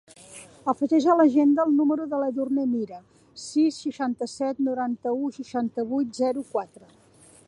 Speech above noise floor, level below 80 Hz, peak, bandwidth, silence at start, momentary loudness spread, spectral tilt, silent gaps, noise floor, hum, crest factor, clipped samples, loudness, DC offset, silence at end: 23 dB; -70 dBFS; -8 dBFS; 11.5 kHz; 0.3 s; 15 LU; -5 dB/octave; none; -47 dBFS; none; 18 dB; under 0.1%; -25 LUFS; under 0.1%; 0.85 s